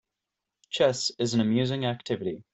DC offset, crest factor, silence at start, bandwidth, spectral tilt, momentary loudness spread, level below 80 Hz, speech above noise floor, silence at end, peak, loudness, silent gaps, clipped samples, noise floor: under 0.1%; 18 dB; 0.7 s; 8.4 kHz; -5 dB/octave; 7 LU; -66 dBFS; 60 dB; 0.1 s; -10 dBFS; -27 LUFS; none; under 0.1%; -86 dBFS